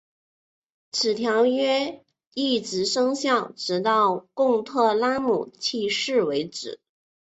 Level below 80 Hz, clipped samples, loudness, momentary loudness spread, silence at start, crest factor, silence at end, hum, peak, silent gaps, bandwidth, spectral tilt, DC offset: -68 dBFS; under 0.1%; -23 LUFS; 10 LU; 0.95 s; 16 dB; 0.65 s; none; -8 dBFS; 2.27-2.31 s; 8.2 kHz; -3.5 dB/octave; under 0.1%